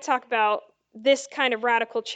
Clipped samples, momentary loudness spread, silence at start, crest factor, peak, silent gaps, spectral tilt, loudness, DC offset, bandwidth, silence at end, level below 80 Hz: under 0.1%; 3 LU; 0 s; 16 dB; -8 dBFS; none; -1.5 dB/octave; -24 LUFS; under 0.1%; 9.2 kHz; 0 s; -82 dBFS